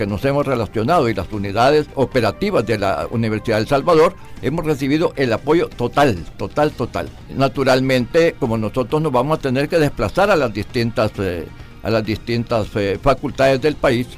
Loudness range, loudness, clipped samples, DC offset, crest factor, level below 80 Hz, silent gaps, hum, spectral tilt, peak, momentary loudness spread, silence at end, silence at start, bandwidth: 2 LU; -18 LUFS; under 0.1%; under 0.1%; 12 dB; -38 dBFS; none; none; -6.5 dB/octave; -4 dBFS; 8 LU; 0 s; 0 s; 15.5 kHz